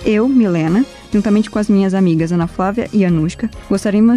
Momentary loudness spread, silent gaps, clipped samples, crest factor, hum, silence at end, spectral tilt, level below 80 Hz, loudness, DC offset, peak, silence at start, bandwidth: 6 LU; none; under 0.1%; 10 dB; none; 0 s; -7.5 dB/octave; -38 dBFS; -15 LUFS; under 0.1%; -4 dBFS; 0 s; 11.5 kHz